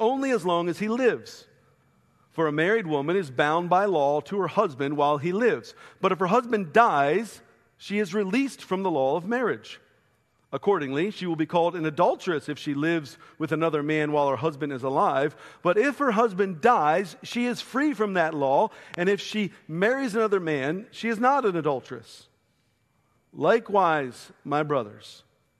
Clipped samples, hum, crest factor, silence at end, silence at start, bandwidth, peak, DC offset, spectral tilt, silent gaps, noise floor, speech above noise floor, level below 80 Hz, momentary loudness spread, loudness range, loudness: under 0.1%; none; 22 dB; 0.45 s; 0 s; 13 kHz; -4 dBFS; under 0.1%; -6 dB/octave; none; -69 dBFS; 44 dB; -72 dBFS; 9 LU; 4 LU; -25 LUFS